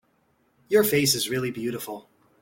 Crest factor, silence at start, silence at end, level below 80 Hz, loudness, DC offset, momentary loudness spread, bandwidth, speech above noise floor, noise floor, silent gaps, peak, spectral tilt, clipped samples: 18 dB; 0.7 s; 0.4 s; -62 dBFS; -24 LUFS; under 0.1%; 16 LU; 17 kHz; 43 dB; -67 dBFS; none; -8 dBFS; -3.5 dB/octave; under 0.1%